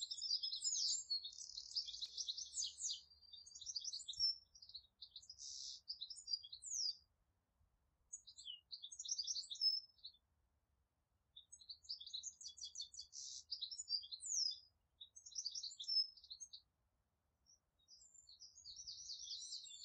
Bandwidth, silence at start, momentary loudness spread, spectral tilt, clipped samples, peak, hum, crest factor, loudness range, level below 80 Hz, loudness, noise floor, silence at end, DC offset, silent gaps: 8.8 kHz; 0 s; 20 LU; 4 dB/octave; under 0.1%; -30 dBFS; none; 20 dB; 8 LU; -84 dBFS; -44 LUFS; -86 dBFS; 0 s; under 0.1%; none